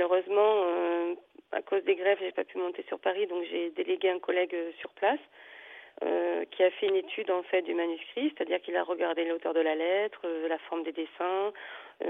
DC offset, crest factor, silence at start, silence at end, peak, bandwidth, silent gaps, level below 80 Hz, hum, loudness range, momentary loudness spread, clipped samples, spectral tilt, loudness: under 0.1%; 18 dB; 0 s; 0 s; -12 dBFS; 3.9 kHz; none; -88 dBFS; none; 2 LU; 10 LU; under 0.1%; -6 dB/octave; -30 LUFS